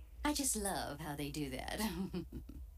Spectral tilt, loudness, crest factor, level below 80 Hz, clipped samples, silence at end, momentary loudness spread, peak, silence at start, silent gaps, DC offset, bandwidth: -3.5 dB/octave; -39 LUFS; 18 dB; -52 dBFS; under 0.1%; 0 s; 10 LU; -22 dBFS; 0 s; none; under 0.1%; 16 kHz